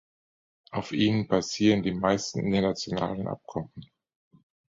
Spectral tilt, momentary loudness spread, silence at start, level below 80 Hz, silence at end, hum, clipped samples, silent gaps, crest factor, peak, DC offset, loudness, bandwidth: -5.5 dB/octave; 12 LU; 0.7 s; -56 dBFS; 0.85 s; none; under 0.1%; none; 20 dB; -8 dBFS; under 0.1%; -27 LUFS; 7.8 kHz